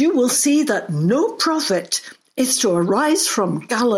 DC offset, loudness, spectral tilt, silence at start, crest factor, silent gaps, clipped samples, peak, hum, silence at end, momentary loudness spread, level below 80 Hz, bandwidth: under 0.1%; -18 LUFS; -3.5 dB/octave; 0 s; 12 dB; none; under 0.1%; -6 dBFS; none; 0 s; 6 LU; -66 dBFS; 16.5 kHz